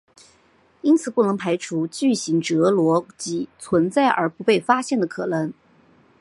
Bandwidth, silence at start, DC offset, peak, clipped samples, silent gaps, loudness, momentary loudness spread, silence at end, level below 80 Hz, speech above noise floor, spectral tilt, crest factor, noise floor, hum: 11.5 kHz; 0.85 s; under 0.1%; -2 dBFS; under 0.1%; none; -21 LUFS; 8 LU; 0.7 s; -66 dBFS; 38 dB; -5.5 dB/octave; 20 dB; -58 dBFS; none